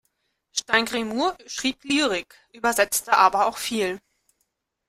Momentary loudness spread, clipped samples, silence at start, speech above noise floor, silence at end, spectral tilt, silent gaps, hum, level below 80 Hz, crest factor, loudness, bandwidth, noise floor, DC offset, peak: 11 LU; under 0.1%; 0.55 s; 52 dB; 0.9 s; -1.5 dB/octave; none; none; -60 dBFS; 22 dB; -23 LUFS; 16 kHz; -75 dBFS; under 0.1%; -2 dBFS